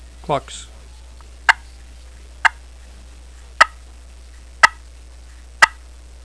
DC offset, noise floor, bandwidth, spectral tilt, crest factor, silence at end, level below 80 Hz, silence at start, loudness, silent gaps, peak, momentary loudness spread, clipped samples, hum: 0.3%; -40 dBFS; 11 kHz; -1.5 dB/octave; 22 dB; 0.55 s; -40 dBFS; 0.3 s; -17 LUFS; none; 0 dBFS; 12 LU; 0.1%; none